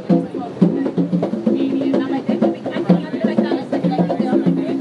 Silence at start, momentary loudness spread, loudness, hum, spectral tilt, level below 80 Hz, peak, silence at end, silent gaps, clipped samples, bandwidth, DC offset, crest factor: 0 s; 3 LU; -18 LUFS; none; -9 dB/octave; -66 dBFS; 0 dBFS; 0 s; none; under 0.1%; 6.8 kHz; under 0.1%; 18 dB